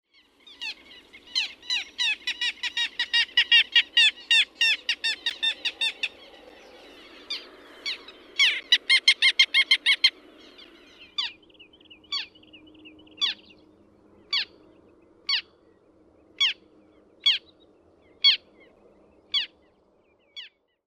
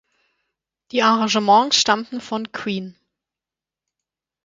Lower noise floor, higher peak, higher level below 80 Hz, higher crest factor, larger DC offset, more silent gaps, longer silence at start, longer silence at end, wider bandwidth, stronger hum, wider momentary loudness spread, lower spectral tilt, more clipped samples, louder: second, -64 dBFS vs -89 dBFS; about the same, -4 dBFS vs -2 dBFS; second, -72 dBFS vs -66 dBFS; about the same, 24 dB vs 20 dB; neither; neither; second, 0.6 s vs 0.95 s; second, 0.4 s vs 1.55 s; first, 14.5 kHz vs 9.6 kHz; neither; first, 18 LU vs 13 LU; second, 2.5 dB/octave vs -2.5 dB/octave; neither; second, -22 LUFS vs -19 LUFS